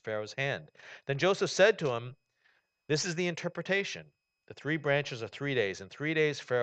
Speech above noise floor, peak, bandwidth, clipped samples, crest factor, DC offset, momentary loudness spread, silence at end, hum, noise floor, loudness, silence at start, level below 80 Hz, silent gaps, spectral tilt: 40 dB; -10 dBFS; 9 kHz; under 0.1%; 22 dB; under 0.1%; 14 LU; 0 s; none; -72 dBFS; -31 LUFS; 0.05 s; -74 dBFS; none; -4.5 dB/octave